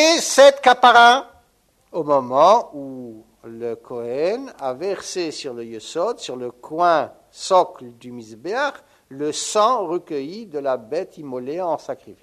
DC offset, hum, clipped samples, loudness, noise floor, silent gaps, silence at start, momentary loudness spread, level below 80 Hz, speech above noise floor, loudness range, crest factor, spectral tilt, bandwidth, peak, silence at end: under 0.1%; none; under 0.1%; -18 LUFS; -61 dBFS; none; 0 s; 21 LU; -66 dBFS; 42 dB; 10 LU; 18 dB; -2.5 dB/octave; 13.5 kHz; 0 dBFS; 0.1 s